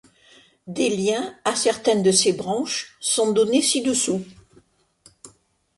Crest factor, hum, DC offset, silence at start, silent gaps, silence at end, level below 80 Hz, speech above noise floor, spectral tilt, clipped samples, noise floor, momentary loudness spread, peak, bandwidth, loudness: 20 dB; none; under 0.1%; 0.65 s; none; 0.5 s; -64 dBFS; 37 dB; -3 dB/octave; under 0.1%; -58 dBFS; 8 LU; -2 dBFS; 11.5 kHz; -21 LUFS